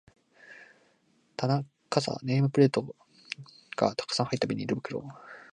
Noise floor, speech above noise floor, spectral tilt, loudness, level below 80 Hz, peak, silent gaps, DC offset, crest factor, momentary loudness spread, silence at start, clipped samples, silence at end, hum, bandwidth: -68 dBFS; 40 dB; -6 dB/octave; -29 LUFS; -70 dBFS; -8 dBFS; none; under 0.1%; 24 dB; 20 LU; 0.5 s; under 0.1%; 0.1 s; none; 10 kHz